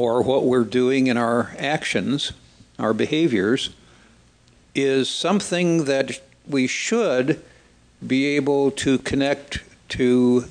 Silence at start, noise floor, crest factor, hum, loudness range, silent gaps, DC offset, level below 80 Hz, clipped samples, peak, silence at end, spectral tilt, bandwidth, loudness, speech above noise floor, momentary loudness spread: 0 s; -55 dBFS; 16 dB; none; 2 LU; none; under 0.1%; -52 dBFS; under 0.1%; -4 dBFS; 0 s; -5 dB/octave; 10 kHz; -21 LUFS; 34 dB; 9 LU